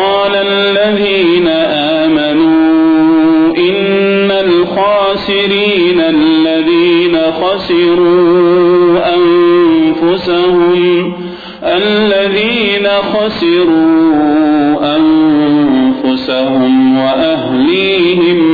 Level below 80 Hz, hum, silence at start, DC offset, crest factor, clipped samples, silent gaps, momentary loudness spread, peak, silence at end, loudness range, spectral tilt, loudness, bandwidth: -44 dBFS; none; 0 s; under 0.1%; 6 dB; under 0.1%; none; 4 LU; -2 dBFS; 0 s; 2 LU; -8 dB/octave; -9 LUFS; 4.9 kHz